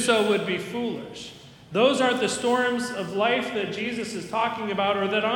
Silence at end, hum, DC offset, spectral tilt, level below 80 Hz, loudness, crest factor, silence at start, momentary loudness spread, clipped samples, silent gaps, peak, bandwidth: 0 s; none; under 0.1%; -3.5 dB/octave; -64 dBFS; -25 LUFS; 20 dB; 0 s; 10 LU; under 0.1%; none; -6 dBFS; 17.5 kHz